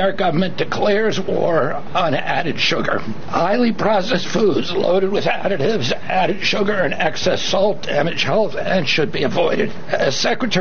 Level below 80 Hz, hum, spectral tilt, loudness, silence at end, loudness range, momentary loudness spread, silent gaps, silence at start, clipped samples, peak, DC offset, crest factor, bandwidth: -50 dBFS; none; -4.5 dB/octave; -18 LUFS; 0 s; 1 LU; 3 LU; none; 0 s; under 0.1%; -4 dBFS; 7%; 14 dB; 6.8 kHz